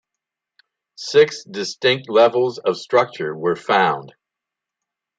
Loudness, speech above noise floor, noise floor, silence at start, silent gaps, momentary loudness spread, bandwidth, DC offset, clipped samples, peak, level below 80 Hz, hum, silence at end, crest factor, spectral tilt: -18 LUFS; 67 dB; -85 dBFS; 1 s; none; 11 LU; 9 kHz; under 0.1%; under 0.1%; -2 dBFS; -70 dBFS; none; 1.1 s; 18 dB; -4 dB/octave